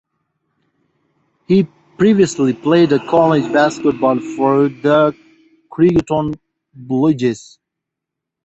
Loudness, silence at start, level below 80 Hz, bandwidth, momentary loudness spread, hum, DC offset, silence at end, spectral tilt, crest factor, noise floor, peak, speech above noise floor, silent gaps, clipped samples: -15 LUFS; 1.5 s; -50 dBFS; 8.2 kHz; 8 LU; none; under 0.1%; 1.05 s; -6.5 dB/octave; 14 dB; -81 dBFS; -2 dBFS; 67 dB; none; under 0.1%